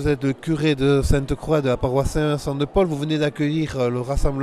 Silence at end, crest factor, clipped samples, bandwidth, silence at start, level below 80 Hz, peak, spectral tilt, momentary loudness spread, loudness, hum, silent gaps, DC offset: 0 s; 16 dB; under 0.1%; 14 kHz; 0 s; -30 dBFS; -4 dBFS; -6.5 dB/octave; 4 LU; -21 LUFS; none; none; under 0.1%